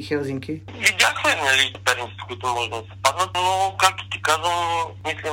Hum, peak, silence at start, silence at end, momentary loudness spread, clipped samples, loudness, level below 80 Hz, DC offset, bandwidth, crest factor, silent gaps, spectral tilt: none; 0 dBFS; 0 s; 0 s; 11 LU; under 0.1%; -21 LUFS; -56 dBFS; under 0.1%; 16.5 kHz; 22 dB; none; -2 dB/octave